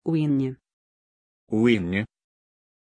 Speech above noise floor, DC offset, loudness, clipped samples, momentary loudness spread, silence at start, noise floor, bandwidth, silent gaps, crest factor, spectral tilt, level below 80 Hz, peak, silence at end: over 67 dB; under 0.1%; -24 LUFS; under 0.1%; 10 LU; 0.05 s; under -90 dBFS; 9.8 kHz; 0.73-1.47 s; 18 dB; -8 dB/octave; -60 dBFS; -8 dBFS; 0.9 s